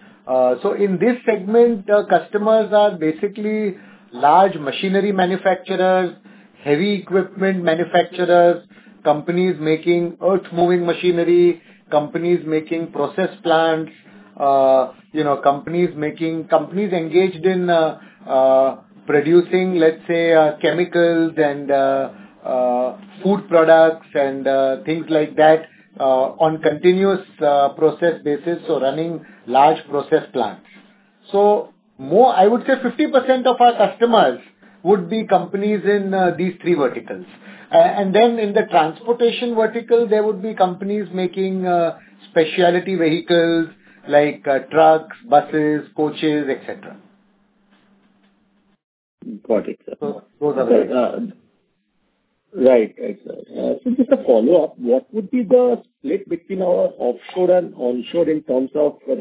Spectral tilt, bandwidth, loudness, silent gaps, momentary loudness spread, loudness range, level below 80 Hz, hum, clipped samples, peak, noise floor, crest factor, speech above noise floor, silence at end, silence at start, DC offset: -10 dB/octave; 4 kHz; -17 LUFS; 48.84-49.18 s; 10 LU; 4 LU; -68 dBFS; none; under 0.1%; 0 dBFS; -67 dBFS; 16 dB; 50 dB; 0 s; 0.25 s; under 0.1%